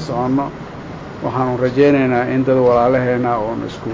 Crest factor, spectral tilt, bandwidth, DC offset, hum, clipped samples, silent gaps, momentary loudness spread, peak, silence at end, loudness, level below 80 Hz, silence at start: 14 dB; -8 dB/octave; 7.6 kHz; under 0.1%; none; under 0.1%; none; 16 LU; -2 dBFS; 0 s; -16 LUFS; -44 dBFS; 0 s